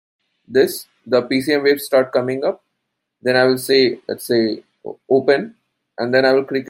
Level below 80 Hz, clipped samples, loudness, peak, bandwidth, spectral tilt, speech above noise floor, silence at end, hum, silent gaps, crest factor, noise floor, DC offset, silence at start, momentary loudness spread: -66 dBFS; under 0.1%; -17 LUFS; -2 dBFS; 16.5 kHz; -4.5 dB/octave; 59 dB; 0 s; none; none; 16 dB; -76 dBFS; under 0.1%; 0.5 s; 14 LU